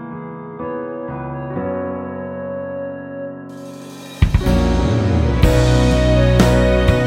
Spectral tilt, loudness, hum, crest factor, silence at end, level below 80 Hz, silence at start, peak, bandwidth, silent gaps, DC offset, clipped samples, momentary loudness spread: -7 dB/octave; -17 LUFS; none; 16 dB; 0 s; -22 dBFS; 0 s; 0 dBFS; 15 kHz; none; under 0.1%; under 0.1%; 17 LU